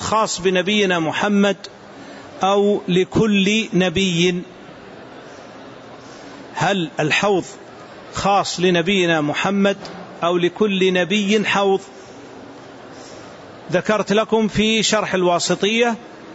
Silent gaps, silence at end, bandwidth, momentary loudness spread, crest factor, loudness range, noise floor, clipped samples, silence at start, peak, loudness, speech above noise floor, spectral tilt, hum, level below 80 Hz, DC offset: none; 0 s; 8 kHz; 22 LU; 14 dB; 5 LU; -38 dBFS; under 0.1%; 0 s; -6 dBFS; -18 LUFS; 21 dB; -4.5 dB/octave; none; -52 dBFS; under 0.1%